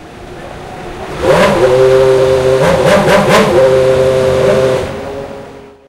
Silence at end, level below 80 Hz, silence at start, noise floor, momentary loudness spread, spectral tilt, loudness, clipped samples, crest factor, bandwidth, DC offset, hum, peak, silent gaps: 0.2 s; -32 dBFS; 0 s; -32 dBFS; 19 LU; -5.5 dB/octave; -9 LUFS; under 0.1%; 10 dB; 15.5 kHz; under 0.1%; none; 0 dBFS; none